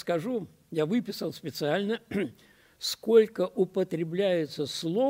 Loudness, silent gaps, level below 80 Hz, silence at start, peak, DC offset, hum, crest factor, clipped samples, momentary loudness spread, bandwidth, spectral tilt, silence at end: -29 LUFS; none; -70 dBFS; 0.05 s; -8 dBFS; under 0.1%; none; 20 dB; under 0.1%; 12 LU; 16 kHz; -5.5 dB/octave; 0 s